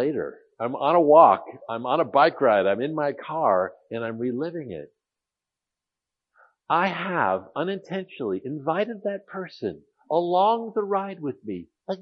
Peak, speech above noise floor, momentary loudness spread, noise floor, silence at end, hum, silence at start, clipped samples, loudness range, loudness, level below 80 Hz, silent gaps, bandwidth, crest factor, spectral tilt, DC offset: -2 dBFS; 65 dB; 15 LU; -88 dBFS; 0 s; none; 0 s; under 0.1%; 9 LU; -24 LUFS; -74 dBFS; none; 6.2 kHz; 22 dB; -8 dB/octave; under 0.1%